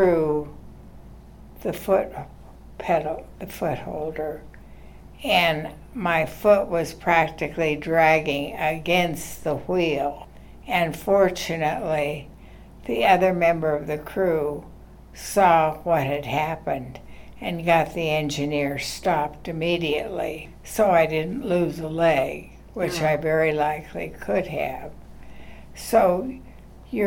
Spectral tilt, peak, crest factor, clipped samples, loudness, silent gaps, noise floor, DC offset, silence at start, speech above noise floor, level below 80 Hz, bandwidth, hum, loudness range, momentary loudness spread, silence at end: -5 dB/octave; -4 dBFS; 20 dB; under 0.1%; -23 LUFS; none; -44 dBFS; under 0.1%; 0 s; 21 dB; -46 dBFS; 18 kHz; none; 5 LU; 15 LU; 0 s